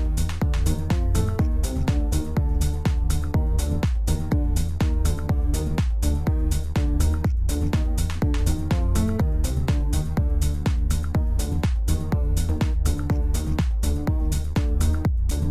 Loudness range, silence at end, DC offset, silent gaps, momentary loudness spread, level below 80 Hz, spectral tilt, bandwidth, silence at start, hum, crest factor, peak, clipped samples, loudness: 1 LU; 0 s; under 0.1%; none; 2 LU; -24 dBFS; -6.5 dB/octave; 15.5 kHz; 0 s; none; 12 dB; -8 dBFS; under 0.1%; -24 LUFS